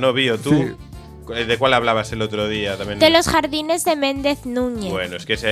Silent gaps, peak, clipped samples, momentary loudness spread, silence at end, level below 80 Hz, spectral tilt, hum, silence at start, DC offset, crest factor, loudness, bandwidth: none; 0 dBFS; under 0.1%; 11 LU; 0 s; -42 dBFS; -4 dB/octave; none; 0 s; under 0.1%; 18 dB; -19 LUFS; 15.5 kHz